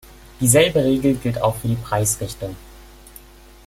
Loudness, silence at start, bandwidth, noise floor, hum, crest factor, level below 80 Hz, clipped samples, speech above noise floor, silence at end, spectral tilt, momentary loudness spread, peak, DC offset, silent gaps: -19 LUFS; 0.4 s; 16.5 kHz; -44 dBFS; none; 20 dB; -42 dBFS; under 0.1%; 25 dB; 0.8 s; -4.5 dB/octave; 16 LU; 0 dBFS; under 0.1%; none